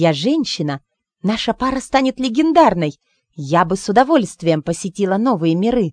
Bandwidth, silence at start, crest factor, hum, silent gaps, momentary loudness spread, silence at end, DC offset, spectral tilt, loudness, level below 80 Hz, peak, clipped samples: 10 kHz; 0 s; 16 dB; none; none; 10 LU; 0 s; under 0.1%; -5.5 dB/octave; -17 LUFS; -46 dBFS; 0 dBFS; under 0.1%